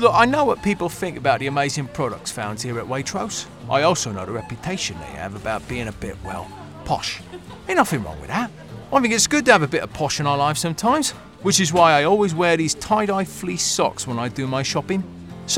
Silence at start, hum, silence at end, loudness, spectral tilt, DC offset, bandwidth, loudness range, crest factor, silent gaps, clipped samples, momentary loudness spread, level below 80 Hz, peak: 0 s; none; 0 s; -21 LUFS; -3.5 dB/octave; 0.1%; 17.5 kHz; 8 LU; 22 dB; none; under 0.1%; 14 LU; -48 dBFS; 0 dBFS